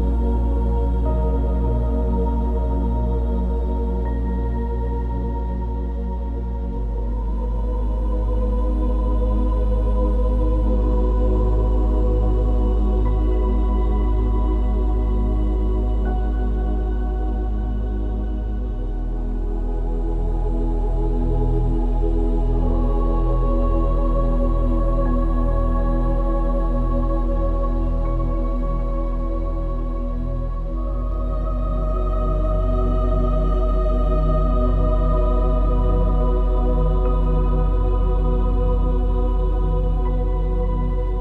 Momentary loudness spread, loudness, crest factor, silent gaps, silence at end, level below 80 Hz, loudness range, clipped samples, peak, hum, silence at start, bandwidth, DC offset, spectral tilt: 6 LU; -23 LUFS; 12 dB; none; 0 s; -20 dBFS; 5 LU; under 0.1%; -8 dBFS; none; 0 s; 3.6 kHz; under 0.1%; -10.5 dB/octave